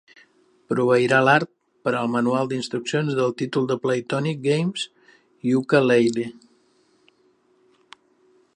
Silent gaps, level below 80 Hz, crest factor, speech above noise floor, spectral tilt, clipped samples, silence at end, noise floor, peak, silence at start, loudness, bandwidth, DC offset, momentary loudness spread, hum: none; -70 dBFS; 20 dB; 41 dB; -6 dB/octave; under 0.1%; 2.25 s; -62 dBFS; -2 dBFS; 0.7 s; -22 LUFS; 10.5 kHz; under 0.1%; 12 LU; none